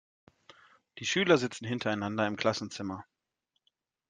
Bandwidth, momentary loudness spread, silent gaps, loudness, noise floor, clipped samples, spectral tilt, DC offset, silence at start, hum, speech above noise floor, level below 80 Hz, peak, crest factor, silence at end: 9.8 kHz; 13 LU; none; -31 LUFS; -82 dBFS; under 0.1%; -4.5 dB/octave; under 0.1%; 0.95 s; none; 52 dB; -72 dBFS; -10 dBFS; 22 dB; 1.05 s